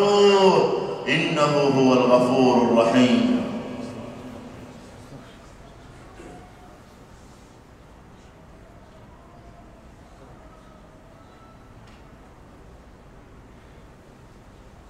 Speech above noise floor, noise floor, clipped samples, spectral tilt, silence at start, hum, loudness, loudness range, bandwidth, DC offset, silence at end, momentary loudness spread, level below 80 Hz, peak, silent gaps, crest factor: 30 dB; -48 dBFS; under 0.1%; -5.5 dB/octave; 0 s; none; -19 LUFS; 27 LU; 11.5 kHz; under 0.1%; 8.5 s; 26 LU; -52 dBFS; -4 dBFS; none; 20 dB